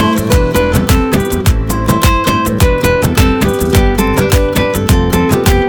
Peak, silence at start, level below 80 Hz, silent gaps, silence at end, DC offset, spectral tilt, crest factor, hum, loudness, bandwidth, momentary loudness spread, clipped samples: 0 dBFS; 0 s; -16 dBFS; none; 0 s; under 0.1%; -5.5 dB/octave; 10 dB; none; -11 LUFS; over 20 kHz; 2 LU; under 0.1%